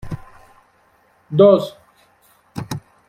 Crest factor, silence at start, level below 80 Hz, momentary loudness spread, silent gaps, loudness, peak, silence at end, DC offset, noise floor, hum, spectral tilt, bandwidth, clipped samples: 20 dB; 0.05 s; -50 dBFS; 22 LU; none; -16 LUFS; -2 dBFS; 0.3 s; under 0.1%; -57 dBFS; none; -7.5 dB/octave; 15 kHz; under 0.1%